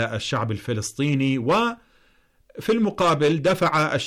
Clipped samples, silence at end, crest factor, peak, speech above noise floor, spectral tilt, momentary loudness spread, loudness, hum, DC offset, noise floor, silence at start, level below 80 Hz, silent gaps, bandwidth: under 0.1%; 0 s; 10 dB; -12 dBFS; 38 dB; -5.5 dB/octave; 7 LU; -22 LUFS; none; under 0.1%; -60 dBFS; 0 s; -56 dBFS; none; 15.5 kHz